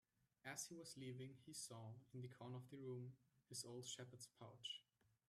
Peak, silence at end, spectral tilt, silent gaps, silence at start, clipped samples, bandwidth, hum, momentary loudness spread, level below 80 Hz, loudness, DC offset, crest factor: -38 dBFS; 0.2 s; -3.5 dB/octave; none; 0.45 s; under 0.1%; 14.5 kHz; none; 7 LU; under -90 dBFS; -56 LUFS; under 0.1%; 18 dB